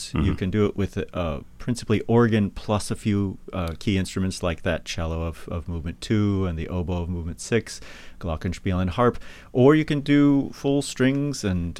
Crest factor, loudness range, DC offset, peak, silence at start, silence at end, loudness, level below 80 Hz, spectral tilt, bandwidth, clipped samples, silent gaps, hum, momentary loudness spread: 20 dB; 6 LU; under 0.1%; -4 dBFS; 0 s; 0 s; -24 LUFS; -40 dBFS; -6.5 dB/octave; 14.5 kHz; under 0.1%; none; none; 12 LU